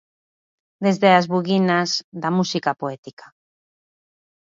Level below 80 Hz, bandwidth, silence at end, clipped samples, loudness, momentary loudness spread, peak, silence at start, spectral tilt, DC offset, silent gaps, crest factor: -70 dBFS; 7.6 kHz; 1.4 s; under 0.1%; -20 LUFS; 12 LU; -2 dBFS; 0.8 s; -5.5 dB/octave; under 0.1%; 2.04-2.12 s, 2.98-3.03 s; 20 dB